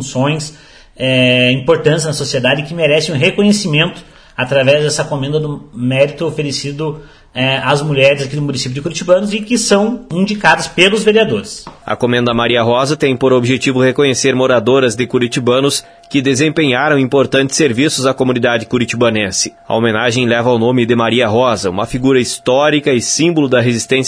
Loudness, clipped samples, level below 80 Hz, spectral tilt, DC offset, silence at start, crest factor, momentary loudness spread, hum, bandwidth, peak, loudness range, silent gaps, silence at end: -13 LUFS; under 0.1%; -46 dBFS; -4.5 dB/octave; under 0.1%; 0 s; 12 dB; 8 LU; none; 11 kHz; 0 dBFS; 3 LU; none; 0 s